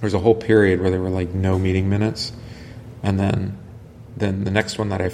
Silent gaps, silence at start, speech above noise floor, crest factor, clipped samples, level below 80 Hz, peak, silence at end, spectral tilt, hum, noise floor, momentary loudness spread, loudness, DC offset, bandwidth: none; 0 s; 20 dB; 20 dB; under 0.1%; -44 dBFS; -2 dBFS; 0 s; -7 dB/octave; none; -40 dBFS; 21 LU; -20 LUFS; under 0.1%; 11.5 kHz